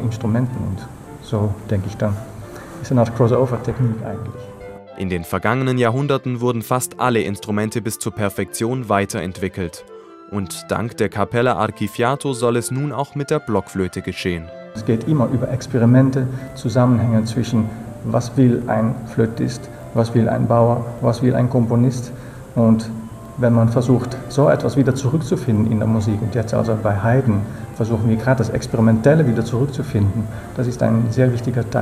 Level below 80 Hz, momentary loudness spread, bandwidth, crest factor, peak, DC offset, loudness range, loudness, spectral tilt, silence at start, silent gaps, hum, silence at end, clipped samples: -44 dBFS; 12 LU; 15 kHz; 18 dB; -2 dBFS; under 0.1%; 4 LU; -19 LUFS; -7 dB/octave; 0 s; none; none; 0 s; under 0.1%